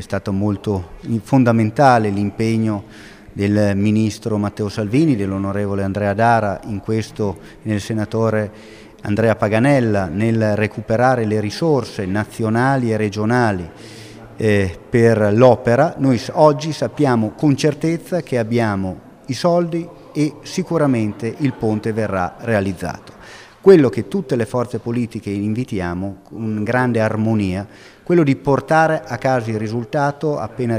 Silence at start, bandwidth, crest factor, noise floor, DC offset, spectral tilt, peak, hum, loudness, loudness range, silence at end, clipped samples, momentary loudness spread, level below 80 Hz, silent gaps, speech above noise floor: 0 s; 14.5 kHz; 18 dB; -40 dBFS; under 0.1%; -7 dB/octave; 0 dBFS; none; -18 LUFS; 5 LU; 0 s; under 0.1%; 11 LU; -48 dBFS; none; 23 dB